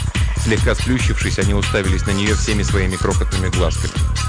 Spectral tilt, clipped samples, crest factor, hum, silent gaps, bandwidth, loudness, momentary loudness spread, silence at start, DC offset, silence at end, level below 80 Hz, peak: -5 dB/octave; under 0.1%; 12 dB; none; none; 10 kHz; -18 LUFS; 2 LU; 0 s; under 0.1%; 0 s; -22 dBFS; -4 dBFS